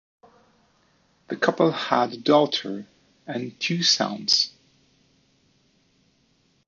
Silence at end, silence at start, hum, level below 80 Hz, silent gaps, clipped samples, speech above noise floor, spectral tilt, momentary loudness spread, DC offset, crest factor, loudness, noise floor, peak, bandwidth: 2.2 s; 1.3 s; none; -74 dBFS; none; under 0.1%; 42 dB; -3.5 dB/octave; 15 LU; under 0.1%; 22 dB; -22 LUFS; -65 dBFS; -4 dBFS; 7.6 kHz